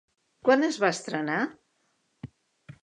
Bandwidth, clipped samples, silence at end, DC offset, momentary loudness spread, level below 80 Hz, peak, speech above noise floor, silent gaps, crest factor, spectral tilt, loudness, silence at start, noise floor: 11 kHz; under 0.1%; 0.1 s; under 0.1%; 24 LU; -70 dBFS; -8 dBFS; 47 dB; none; 20 dB; -4.5 dB/octave; -26 LUFS; 0.45 s; -73 dBFS